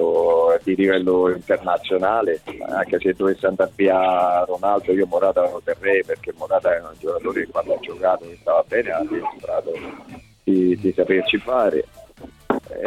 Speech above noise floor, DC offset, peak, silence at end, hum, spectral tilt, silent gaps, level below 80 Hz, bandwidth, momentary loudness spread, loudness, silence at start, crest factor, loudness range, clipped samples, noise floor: 23 dB; under 0.1%; -4 dBFS; 0 s; none; -6.5 dB/octave; none; -54 dBFS; 12.5 kHz; 9 LU; -20 LUFS; 0 s; 16 dB; 3 LU; under 0.1%; -43 dBFS